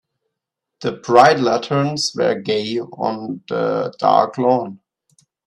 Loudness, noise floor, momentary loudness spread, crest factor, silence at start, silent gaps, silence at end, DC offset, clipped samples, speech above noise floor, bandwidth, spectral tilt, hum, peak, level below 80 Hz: -18 LUFS; -81 dBFS; 14 LU; 18 dB; 0.8 s; none; 0.7 s; under 0.1%; under 0.1%; 64 dB; 12 kHz; -5 dB/octave; none; 0 dBFS; -62 dBFS